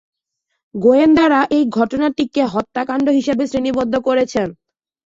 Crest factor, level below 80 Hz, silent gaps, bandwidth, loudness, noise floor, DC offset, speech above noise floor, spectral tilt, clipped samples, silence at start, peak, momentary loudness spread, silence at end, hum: 14 dB; -50 dBFS; none; 7.8 kHz; -16 LUFS; -75 dBFS; under 0.1%; 59 dB; -6 dB/octave; under 0.1%; 0.75 s; -2 dBFS; 10 LU; 0.55 s; none